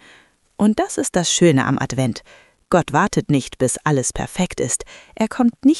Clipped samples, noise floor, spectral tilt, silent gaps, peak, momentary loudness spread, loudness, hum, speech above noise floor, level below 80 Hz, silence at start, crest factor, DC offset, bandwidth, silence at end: under 0.1%; -52 dBFS; -4.5 dB/octave; none; 0 dBFS; 9 LU; -19 LUFS; none; 33 dB; -44 dBFS; 0.6 s; 18 dB; under 0.1%; 12 kHz; 0 s